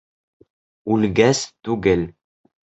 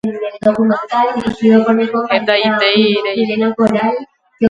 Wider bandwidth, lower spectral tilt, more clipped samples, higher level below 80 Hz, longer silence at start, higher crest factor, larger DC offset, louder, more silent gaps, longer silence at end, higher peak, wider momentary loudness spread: about the same, 8.2 kHz vs 7.6 kHz; second, -5 dB/octave vs -6.5 dB/octave; neither; first, -46 dBFS vs -52 dBFS; first, 0.85 s vs 0.05 s; first, 20 dB vs 14 dB; neither; second, -19 LUFS vs -14 LUFS; neither; first, 0.6 s vs 0 s; about the same, -2 dBFS vs 0 dBFS; first, 13 LU vs 5 LU